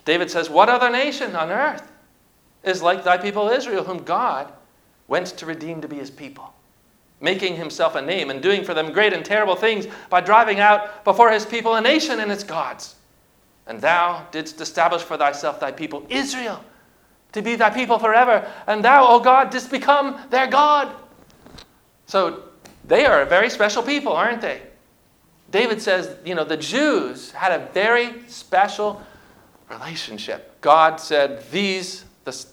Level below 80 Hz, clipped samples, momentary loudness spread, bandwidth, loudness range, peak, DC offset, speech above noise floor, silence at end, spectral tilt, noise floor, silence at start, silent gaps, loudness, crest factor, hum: -60 dBFS; under 0.1%; 16 LU; 18 kHz; 8 LU; 0 dBFS; under 0.1%; 39 dB; 0.1 s; -3.5 dB/octave; -58 dBFS; 0.05 s; none; -19 LUFS; 20 dB; none